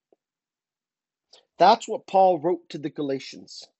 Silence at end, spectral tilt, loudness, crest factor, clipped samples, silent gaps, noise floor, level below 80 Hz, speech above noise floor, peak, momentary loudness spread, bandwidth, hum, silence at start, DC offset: 0.2 s; -5 dB/octave; -22 LUFS; 22 dB; under 0.1%; none; under -90 dBFS; -76 dBFS; over 67 dB; -4 dBFS; 16 LU; 8.2 kHz; none; 1.6 s; under 0.1%